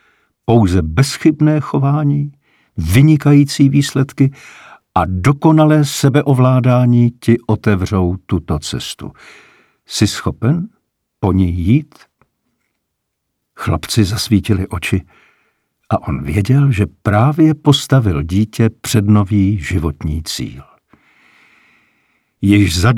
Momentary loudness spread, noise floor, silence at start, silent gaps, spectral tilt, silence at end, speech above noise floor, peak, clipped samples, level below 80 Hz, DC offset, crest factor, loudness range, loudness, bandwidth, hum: 10 LU; -73 dBFS; 0.5 s; none; -6.5 dB/octave; 0 s; 60 dB; 0 dBFS; under 0.1%; -36 dBFS; under 0.1%; 14 dB; 7 LU; -14 LUFS; 15 kHz; none